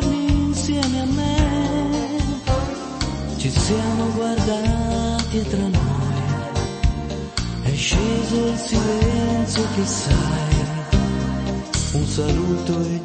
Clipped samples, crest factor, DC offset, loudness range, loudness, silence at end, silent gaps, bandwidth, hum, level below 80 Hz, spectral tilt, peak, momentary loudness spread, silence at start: under 0.1%; 16 dB; under 0.1%; 2 LU; -21 LUFS; 0 s; none; 8.8 kHz; none; -28 dBFS; -5.5 dB/octave; -4 dBFS; 4 LU; 0 s